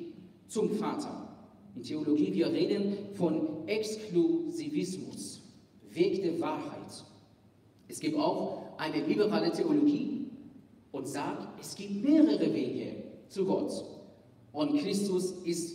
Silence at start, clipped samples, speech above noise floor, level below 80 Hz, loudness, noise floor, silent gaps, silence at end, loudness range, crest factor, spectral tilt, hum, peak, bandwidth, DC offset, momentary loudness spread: 0 s; under 0.1%; 31 dB; -76 dBFS; -32 LUFS; -61 dBFS; none; 0 s; 4 LU; 20 dB; -5.5 dB/octave; none; -12 dBFS; 15.5 kHz; under 0.1%; 17 LU